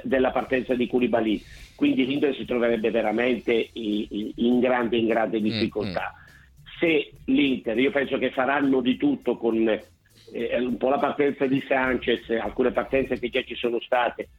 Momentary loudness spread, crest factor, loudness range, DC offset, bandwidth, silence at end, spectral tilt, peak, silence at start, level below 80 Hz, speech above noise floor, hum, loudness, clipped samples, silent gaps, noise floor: 6 LU; 18 dB; 1 LU; under 0.1%; 11 kHz; 0.15 s; -7 dB/octave; -6 dBFS; 0 s; -52 dBFS; 26 dB; none; -24 LUFS; under 0.1%; none; -49 dBFS